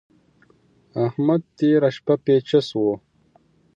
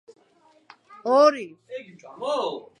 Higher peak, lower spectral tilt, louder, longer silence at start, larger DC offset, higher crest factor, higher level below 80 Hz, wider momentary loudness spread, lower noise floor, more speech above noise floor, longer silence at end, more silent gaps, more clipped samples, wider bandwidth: about the same, -6 dBFS vs -6 dBFS; first, -8 dB/octave vs -4 dB/octave; about the same, -20 LUFS vs -22 LUFS; about the same, 0.95 s vs 1.05 s; neither; about the same, 16 dB vs 20 dB; first, -66 dBFS vs -84 dBFS; second, 7 LU vs 21 LU; about the same, -59 dBFS vs -60 dBFS; about the same, 39 dB vs 36 dB; first, 0.8 s vs 0.2 s; neither; neither; second, 7.8 kHz vs 9.8 kHz